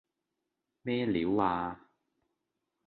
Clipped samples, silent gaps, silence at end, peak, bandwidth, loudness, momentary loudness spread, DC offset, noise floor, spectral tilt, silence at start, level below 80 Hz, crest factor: under 0.1%; none; 1.1 s; -14 dBFS; 4.6 kHz; -32 LUFS; 13 LU; under 0.1%; -86 dBFS; -9.5 dB/octave; 0.85 s; -62 dBFS; 20 dB